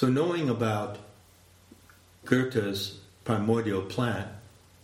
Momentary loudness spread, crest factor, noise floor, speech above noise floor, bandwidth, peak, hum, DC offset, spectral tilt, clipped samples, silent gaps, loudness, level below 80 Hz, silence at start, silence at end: 15 LU; 22 dB; -57 dBFS; 30 dB; 16.5 kHz; -6 dBFS; none; under 0.1%; -6.5 dB/octave; under 0.1%; none; -29 LUFS; -64 dBFS; 0 s; 0.35 s